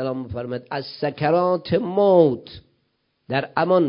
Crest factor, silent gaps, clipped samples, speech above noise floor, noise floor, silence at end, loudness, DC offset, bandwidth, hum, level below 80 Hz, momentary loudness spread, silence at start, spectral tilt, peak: 18 dB; none; under 0.1%; 50 dB; -70 dBFS; 0 s; -21 LUFS; under 0.1%; 5.4 kHz; none; -52 dBFS; 13 LU; 0 s; -11.5 dB/octave; -2 dBFS